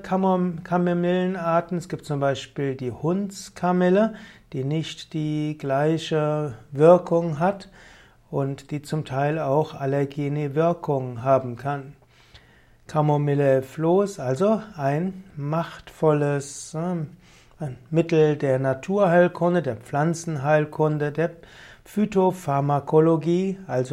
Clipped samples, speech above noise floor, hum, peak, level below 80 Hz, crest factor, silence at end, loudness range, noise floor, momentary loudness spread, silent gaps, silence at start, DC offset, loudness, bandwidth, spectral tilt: under 0.1%; 32 dB; none; -4 dBFS; -58 dBFS; 20 dB; 0 s; 3 LU; -54 dBFS; 11 LU; none; 0 s; under 0.1%; -23 LUFS; 13.5 kHz; -7 dB/octave